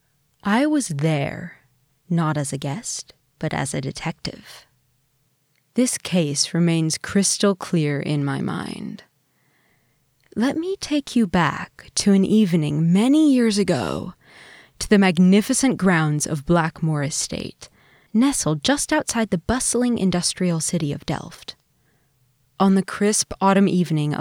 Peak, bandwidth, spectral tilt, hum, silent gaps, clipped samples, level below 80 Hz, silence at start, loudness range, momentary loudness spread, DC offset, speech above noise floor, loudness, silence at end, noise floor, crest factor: -4 dBFS; 16.5 kHz; -5 dB/octave; none; none; under 0.1%; -50 dBFS; 0.45 s; 8 LU; 14 LU; under 0.1%; 45 dB; -21 LUFS; 0 s; -65 dBFS; 18 dB